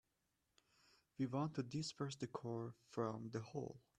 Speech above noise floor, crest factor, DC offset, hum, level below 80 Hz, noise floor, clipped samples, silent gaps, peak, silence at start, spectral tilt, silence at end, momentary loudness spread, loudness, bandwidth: 41 dB; 20 dB; under 0.1%; none; -80 dBFS; -87 dBFS; under 0.1%; none; -28 dBFS; 1.2 s; -6 dB/octave; 0.2 s; 7 LU; -46 LUFS; 11 kHz